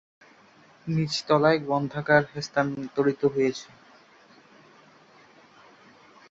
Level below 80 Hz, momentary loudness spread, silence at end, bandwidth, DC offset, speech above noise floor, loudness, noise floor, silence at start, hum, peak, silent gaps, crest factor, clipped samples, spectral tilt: -64 dBFS; 8 LU; 2.65 s; 8 kHz; under 0.1%; 31 dB; -25 LUFS; -56 dBFS; 0.85 s; none; -4 dBFS; none; 24 dB; under 0.1%; -5.5 dB/octave